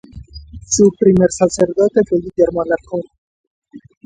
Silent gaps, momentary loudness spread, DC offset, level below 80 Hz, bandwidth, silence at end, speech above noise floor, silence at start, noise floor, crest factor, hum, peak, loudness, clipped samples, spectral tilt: 3.18-3.62 s; 8 LU; under 0.1%; -42 dBFS; 9.4 kHz; 0.25 s; 21 dB; 0.15 s; -36 dBFS; 16 dB; none; 0 dBFS; -15 LUFS; under 0.1%; -5.5 dB/octave